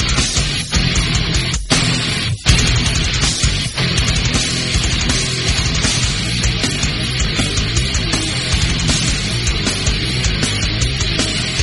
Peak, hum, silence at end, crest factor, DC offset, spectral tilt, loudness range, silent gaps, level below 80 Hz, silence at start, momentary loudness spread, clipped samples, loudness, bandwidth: 0 dBFS; none; 0 s; 16 dB; under 0.1%; -3 dB/octave; 1 LU; none; -22 dBFS; 0 s; 3 LU; under 0.1%; -16 LUFS; 11.5 kHz